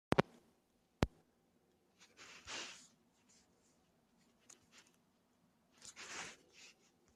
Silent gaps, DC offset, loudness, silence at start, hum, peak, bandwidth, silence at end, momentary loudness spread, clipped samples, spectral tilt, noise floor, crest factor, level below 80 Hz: none; under 0.1%; -44 LUFS; 0.1 s; none; -10 dBFS; 13.5 kHz; 0.45 s; 24 LU; under 0.1%; -5 dB/octave; -77 dBFS; 38 dB; -62 dBFS